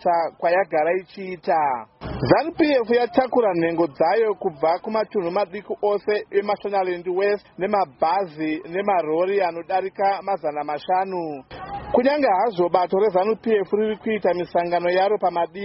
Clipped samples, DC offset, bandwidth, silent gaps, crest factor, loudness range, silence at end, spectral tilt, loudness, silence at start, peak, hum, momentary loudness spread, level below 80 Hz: under 0.1%; under 0.1%; 5.8 kHz; none; 20 dB; 3 LU; 0 s; -4 dB/octave; -22 LUFS; 0 s; -2 dBFS; none; 7 LU; -54 dBFS